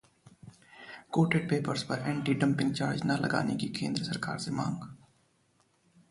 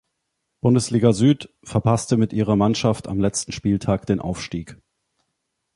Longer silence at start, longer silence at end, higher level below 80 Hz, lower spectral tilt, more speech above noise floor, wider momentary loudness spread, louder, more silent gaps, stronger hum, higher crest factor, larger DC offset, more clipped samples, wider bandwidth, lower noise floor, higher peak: second, 0.45 s vs 0.65 s; first, 1.15 s vs 1 s; second, -64 dBFS vs -46 dBFS; about the same, -6 dB/octave vs -6 dB/octave; second, 40 dB vs 57 dB; first, 12 LU vs 8 LU; second, -31 LUFS vs -21 LUFS; neither; neither; about the same, 18 dB vs 18 dB; neither; neither; about the same, 11.5 kHz vs 11.5 kHz; second, -70 dBFS vs -77 dBFS; second, -14 dBFS vs -2 dBFS